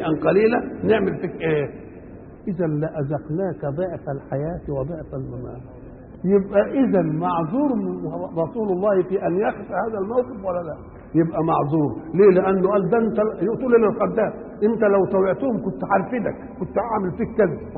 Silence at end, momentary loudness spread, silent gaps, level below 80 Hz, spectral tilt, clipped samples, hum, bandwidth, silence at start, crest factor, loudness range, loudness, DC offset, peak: 0 s; 13 LU; none; -48 dBFS; -12.5 dB/octave; under 0.1%; none; 4.4 kHz; 0 s; 16 dB; 7 LU; -22 LUFS; under 0.1%; -4 dBFS